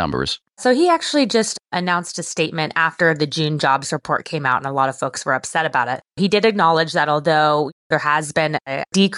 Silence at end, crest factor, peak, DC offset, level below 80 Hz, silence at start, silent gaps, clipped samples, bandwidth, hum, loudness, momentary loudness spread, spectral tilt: 0 s; 14 dB; -4 dBFS; under 0.1%; -54 dBFS; 0 s; 7.72-7.90 s; under 0.1%; 12 kHz; none; -19 LUFS; 7 LU; -4 dB/octave